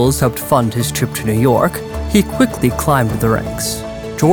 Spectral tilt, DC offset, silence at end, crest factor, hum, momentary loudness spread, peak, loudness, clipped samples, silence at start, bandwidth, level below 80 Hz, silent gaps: -5.5 dB/octave; under 0.1%; 0 s; 14 dB; none; 7 LU; 0 dBFS; -16 LUFS; under 0.1%; 0 s; over 20 kHz; -30 dBFS; none